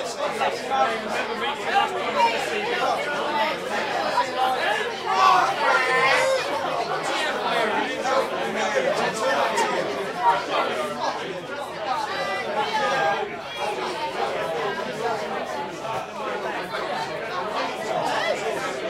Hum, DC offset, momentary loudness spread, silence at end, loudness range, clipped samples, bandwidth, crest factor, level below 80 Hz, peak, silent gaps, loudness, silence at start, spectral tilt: none; under 0.1%; 9 LU; 0 s; 7 LU; under 0.1%; 16 kHz; 20 dB; -64 dBFS; -4 dBFS; none; -24 LUFS; 0 s; -3 dB/octave